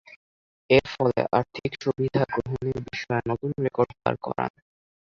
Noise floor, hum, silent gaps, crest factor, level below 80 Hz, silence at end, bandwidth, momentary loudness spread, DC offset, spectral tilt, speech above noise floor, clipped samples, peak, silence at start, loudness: under -90 dBFS; none; 0.16-0.69 s; 22 dB; -54 dBFS; 0.65 s; 7.2 kHz; 9 LU; under 0.1%; -7 dB/octave; over 65 dB; under 0.1%; -4 dBFS; 0.1 s; -26 LUFS